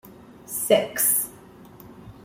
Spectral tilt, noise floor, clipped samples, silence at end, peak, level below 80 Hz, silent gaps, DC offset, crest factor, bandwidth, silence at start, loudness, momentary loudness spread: -2 dB/octave; -47 dBFS; under 0.1%; 0.15 s; -6 dBFS; -60 dBFS; none; under 0.1%; 22 dB; 16.5 kHz; 0.05 s; -22 LUFS; 13 LU